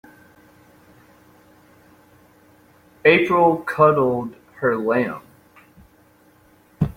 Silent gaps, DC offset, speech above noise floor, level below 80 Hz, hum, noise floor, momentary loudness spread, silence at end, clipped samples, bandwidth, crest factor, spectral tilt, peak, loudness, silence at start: none; under 0.1%; 37 dB; -52 dBFS; none; -54 dBFS; 12 LU; 0.05 s; under 0.1%; 16.5 kHz; 20 dB; -7.5 dB/octave; -2 dBFS; -18 LUFS; 3.05 s